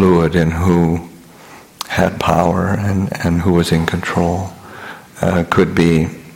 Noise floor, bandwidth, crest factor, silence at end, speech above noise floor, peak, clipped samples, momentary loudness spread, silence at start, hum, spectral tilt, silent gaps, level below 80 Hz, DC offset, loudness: -40 dBFS; 16.5 kHz; 14 dB; 0 s; 26 dB; -2 dBFS; under 0.1%; 14 LU; 0 s; none; -6.5 dB/octave; none; -36 dBFS; under 0.1%; -15 LUFS